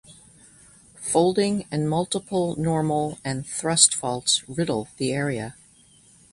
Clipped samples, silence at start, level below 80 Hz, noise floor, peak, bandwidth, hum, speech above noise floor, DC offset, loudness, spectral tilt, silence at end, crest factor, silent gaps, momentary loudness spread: under 0.1%; 0.1 s; -56 dBFS; -55 dBFS; 0 dBFS; 11.5 kHz; none; 31 dB; under 0.1%; -23 LUFS; -3.5 dB/octave; 0.8 s; 24 dB; none; 11 LU